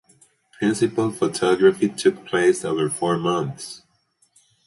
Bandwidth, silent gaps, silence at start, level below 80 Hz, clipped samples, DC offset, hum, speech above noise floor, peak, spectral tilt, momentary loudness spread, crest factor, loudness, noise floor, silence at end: 11.5 kHz; none; 0.6 s; -62 dBFS; under 0.1%; under 0.1%; none; 44 dB; -4 dBFS; -5 dB/octave; 11 LU; 18 dB; -21 LUFS; -65 dBFS; 0.9 s